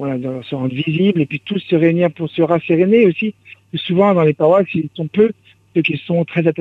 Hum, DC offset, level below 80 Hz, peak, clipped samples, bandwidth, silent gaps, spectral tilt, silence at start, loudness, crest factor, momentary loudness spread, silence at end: none; under 0.1%; -60 dBFS; -2 dBFS; under 0.1%; 4.6 kHz; none; -9.5 dB/octave; 0 s; -16 LUFS; 14 dB; 10 LU; 0 s